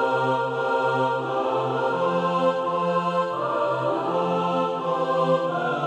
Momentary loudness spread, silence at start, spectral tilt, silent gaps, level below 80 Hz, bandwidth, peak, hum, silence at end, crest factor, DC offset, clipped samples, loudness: 3 LU; 0 s; -6.5 dB/octave; none; -72 dBFS; 9.2 kHz; -10 dBFS; none; 0 s; 12 dB; under 0.1%; under 0.1%; -24 LUFS